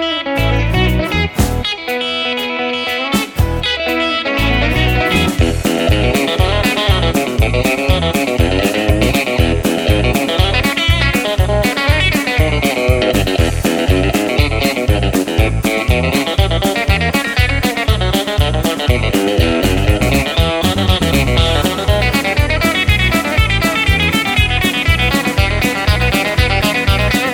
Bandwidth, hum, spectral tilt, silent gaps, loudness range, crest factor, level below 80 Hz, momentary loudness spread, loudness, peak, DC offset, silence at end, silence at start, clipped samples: 18.5 kHz; none; -5 dB/octave; none; 2 LU; 14 dB; -20 dBFS; 3 LU; -14 LUFS; 0 dBFS; under 0.1%; 0 s; 0 s; under 0.1%